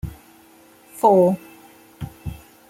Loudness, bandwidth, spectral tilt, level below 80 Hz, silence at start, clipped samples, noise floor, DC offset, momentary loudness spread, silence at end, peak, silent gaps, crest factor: -18 LUFS; 16.5 kHz; -8 dB/octave; -46 dBFS; 0.05 s; under 0.1%; -50 dBFS; under 0.1%; 22 LU; 0.35 s; -4 dBFS; none; 20 dB